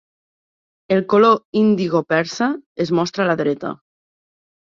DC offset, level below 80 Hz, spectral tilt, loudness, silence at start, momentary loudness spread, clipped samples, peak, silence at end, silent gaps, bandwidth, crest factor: under 0.1%; -62 dBFS; -6 dB/octave; -18 LUFS; 0.9 s; 10 LU; under 0.1%; -2 dBFS; 0.9 s; 1.45-1.53 s, 2.66-2.75 s; 7.6 kHz; 18 dB